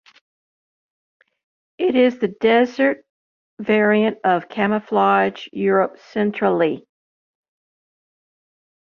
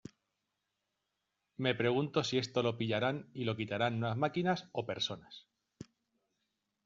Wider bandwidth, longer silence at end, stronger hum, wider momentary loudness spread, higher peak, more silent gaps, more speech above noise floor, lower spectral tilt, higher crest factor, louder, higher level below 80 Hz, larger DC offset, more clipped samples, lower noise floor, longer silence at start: second, 6.8 kHz vs 7.6 kHz; first, 2 s vs 1.05 s; neither; second, 7 LU vs 22 LU; first, -2 dBFS vs -16 dBFS; first, 3.10-3.57 s vs none; first, over 72 dB vs 51 dB; first, -7.5 dB/octave vs -4 dB/octave; about the same, 18 dB vs 22 dB; first, -19 LUFS vs -35 LUFS; first, -66 dBFS vs -74 dBFS; neither; neither; first, under -90 dBFS vs -86 dBFS; first, 1.8 s vs 1.6 s